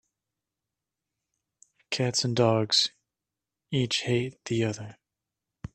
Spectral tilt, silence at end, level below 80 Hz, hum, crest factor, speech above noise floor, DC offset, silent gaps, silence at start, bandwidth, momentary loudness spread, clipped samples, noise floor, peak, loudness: -4.5 dB/octave; 0.1 s; -62 dBFS; none; 22 dB; 62 dB; under 0.1%; none; 1.9 s; 12.5 kHz; 12 LU; under 0.1%; -89 dBFS; -8 dBFS; -26 LUFS